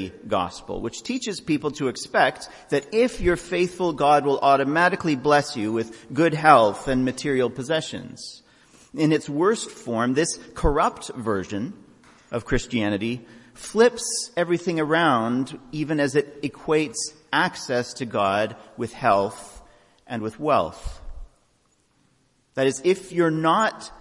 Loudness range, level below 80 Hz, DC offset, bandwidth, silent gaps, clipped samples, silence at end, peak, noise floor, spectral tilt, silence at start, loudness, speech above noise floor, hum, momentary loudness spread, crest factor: 6 LU; -44 dBFS; under 0.1%; 11.5 kHz; none; under 0.1%; 0.05 s; 0 dBFS; -65 dBFS; -4.5 dB/octave; 0 s; -23 LUFS; 42 dB; none; 12 LU; 22 dB